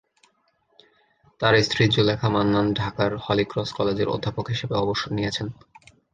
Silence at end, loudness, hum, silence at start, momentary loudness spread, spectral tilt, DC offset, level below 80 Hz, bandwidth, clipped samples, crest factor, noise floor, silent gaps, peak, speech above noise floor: 0.6 s; -23 LUFS; none; 1.4 s; 8 LU; -6 dB/octave; under 0.1%; -50 dBFS; 9.2 kHz; under 0.1%; 20 dB; -67 dBFS; none; -4 dBFS; 44 dB